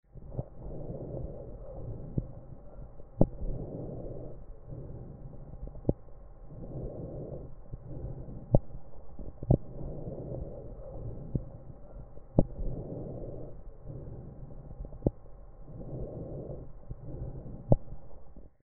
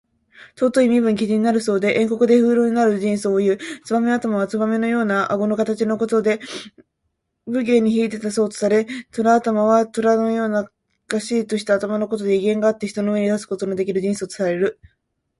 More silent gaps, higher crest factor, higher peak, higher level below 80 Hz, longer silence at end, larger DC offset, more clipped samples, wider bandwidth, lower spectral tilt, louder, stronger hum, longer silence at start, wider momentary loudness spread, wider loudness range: neither; first, 32 dB vs 16 dB; about the same, -4 dBFS vs -2 dBFS; first, -42 dBFS vs -62 dBFS; second, 0.1 s vs 0.7 s; neither; neither; second, 1.8 kHz vs 11.5 kHz; first, -12.5 dB/octave vs -6 dB/octave; second, -38 LUFS vs -19 LUFS; neither; second, 0.15 s vs 0.4 s; first, 20 LU vs 7 LU; about the same, 6 LU vs 4 LU